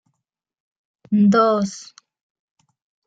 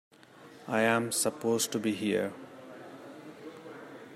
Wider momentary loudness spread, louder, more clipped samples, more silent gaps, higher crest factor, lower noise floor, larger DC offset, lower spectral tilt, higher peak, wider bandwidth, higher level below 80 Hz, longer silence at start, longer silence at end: second, 14 LU vs 21 LU; first, -18 LUFS vs -30 LUFS; neither; neither; second, 16 dB vs 22 dB; first, -80 dBFS vs -54 dBFS; neither; first, -7 dB/octave vs -3.5 dB/octave; first, -6 dBFS vs -12 dBFS; second, 7.8 kHz vs 16 kHz; first, -66 dBFS vs -78 dBFS; first, 1.1 s vs 0.35 s; first, 1.25 s vs 0 s